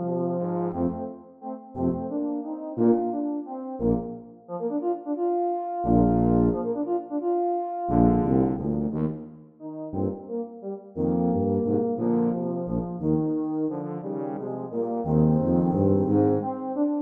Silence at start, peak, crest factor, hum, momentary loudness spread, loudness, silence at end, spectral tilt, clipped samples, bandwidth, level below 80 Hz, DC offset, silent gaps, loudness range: 0 s; -6 dBFS; 18 dB; none; 13 LU; -26 LUFS; 0 s; -13.5 dB/octave; under 0.1%; 2.7 kHz; -44 dBFS; under 0.1%; none; 4 LU